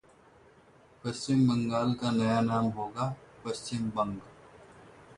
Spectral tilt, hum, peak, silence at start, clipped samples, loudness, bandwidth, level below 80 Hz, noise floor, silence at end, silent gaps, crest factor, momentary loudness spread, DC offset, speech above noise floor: -6.5 dB/octave; none; -16 dBFS; 1.05 s; under 0.1%; -30 LUFS; 11 kHz; -62 dBFS; -59 dBFS; 0.05 s; none; 16 dB; 12 LU; under 0.1%; 30 dB